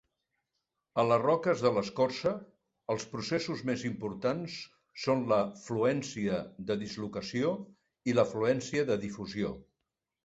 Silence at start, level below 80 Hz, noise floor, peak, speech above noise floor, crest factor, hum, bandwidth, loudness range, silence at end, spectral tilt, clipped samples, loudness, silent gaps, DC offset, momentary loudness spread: 0.95 s; -64 dBFS; -87 dBFS; -12 dBFS; 55 dB; 20 dB; none; 8 kHz; 3 LU; 0.6 s; -5.5 dB/octave; under 0.1%; -32 LUFS; none; under 0.1%; 10 LU